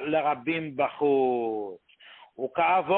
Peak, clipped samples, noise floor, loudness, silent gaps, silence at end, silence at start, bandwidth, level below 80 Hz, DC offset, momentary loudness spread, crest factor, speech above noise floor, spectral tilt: -12 dBFS; under 0.1%; -53 dBFS; -27 LUFS; none; 0 s; 0 s; 4.2 kHz; -70 dBFS; under 0.1%; 12 LU; 14 dB; 27 dB; -9.5 dB/octave